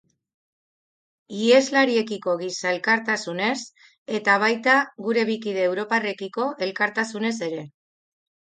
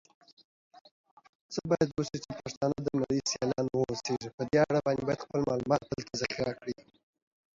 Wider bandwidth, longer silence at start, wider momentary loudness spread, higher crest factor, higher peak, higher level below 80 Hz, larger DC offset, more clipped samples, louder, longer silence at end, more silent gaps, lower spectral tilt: first, 9.4 kHz vs 7.8 kHz; first, 1.3 s vs 0.75 s; about the same, 11 LU vs 11 LU; about the same, 20 dB vs 20 dB; first, -4 dBFS vs -12 dBFS; second, -76 dBFS vs -60 dBFS; neither; neither; first, -22 LUFS vs -32 LUFS; about the same, 0.8 s vs 0.85 s; second, 3.98-4.06 s vs 0.81-0.85 s, 0.91-1.04 s, 1.11-1.17 s, 1.29-1.49 s, 2.57-2.61 s, 4.34-4.38 s; second, -3.5 dB/octave vs -5 dB/octave